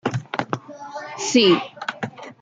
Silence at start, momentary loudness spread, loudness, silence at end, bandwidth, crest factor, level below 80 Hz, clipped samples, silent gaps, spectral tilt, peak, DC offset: 0.05 s; 18 LU; -21 LUFS; 0.1 s; 9.4 kHz; 18 dB; -66 dBFS; under 0.1%; none; -4 dB/octave; -4 dBFS; under 0.1%